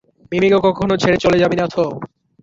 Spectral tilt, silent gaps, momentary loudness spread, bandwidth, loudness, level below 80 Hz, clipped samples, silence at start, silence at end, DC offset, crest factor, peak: -6 dB/octave; none; 10 LU; 7.8 kHz; -16 LUFS; -46 dBFS; under 0.1%; 0.3 s; 0.35 s; under 0.1%; 14 dB; -2 dBFS